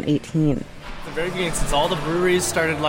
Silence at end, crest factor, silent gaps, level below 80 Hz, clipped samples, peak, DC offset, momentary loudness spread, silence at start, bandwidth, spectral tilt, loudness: 0 s; 14 dB; none; -34 dBFS; under 0.1%; -8 dBFS; under 0.1%; 11 LU; 0 s; 16.5 kHz; -4.5 dB/octave; -22 LUFS